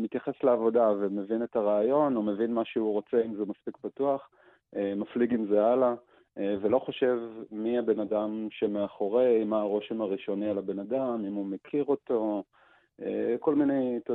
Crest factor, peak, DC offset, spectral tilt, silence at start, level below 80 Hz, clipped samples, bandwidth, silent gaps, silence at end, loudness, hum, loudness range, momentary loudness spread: 18 dB; -12 dBFS; under 0.1%; -9.5 dB/octave; 0 s; -72 dBFS; under 0.1%; 4.1 kHz; none; 0 s; -29 LUFS; none; 3 LU; 10 LU